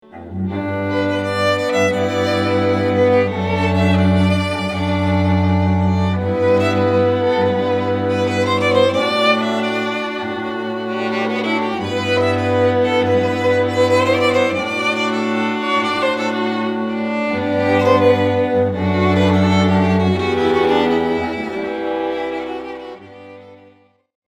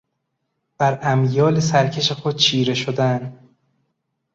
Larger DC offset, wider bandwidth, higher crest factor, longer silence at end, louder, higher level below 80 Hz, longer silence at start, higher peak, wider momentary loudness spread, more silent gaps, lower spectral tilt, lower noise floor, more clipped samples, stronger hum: neither; first, 12 kHz vs 7.8 kHz; about the same, 16 dB vs 18 dB; second, 0.75 s vs 1 s; about the same, -17 LUFS vs -18 LUFS; first, -48 dBFS vs -56 dBFS; second, 0.15 s vs 0.8 s; first, 0 dBFS vs -4 dBFS; first, 8 LU vs 5 LU; neither; first, -6.5 dB/octave vs -5 dB/octave; second, -51 dBFS vs -75 dBFS; neither; neither